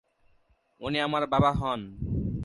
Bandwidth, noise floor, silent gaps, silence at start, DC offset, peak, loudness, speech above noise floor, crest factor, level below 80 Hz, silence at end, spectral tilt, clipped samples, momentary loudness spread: 11.5 kHz; -66 dBFS; none; 0.8 s; under 0.1%; -10 dBFS; -28 LUFS; 39 dB; 20 dB; -44 dBFS; 0 s; -7 dB/octave; under 0.1%; 10 LU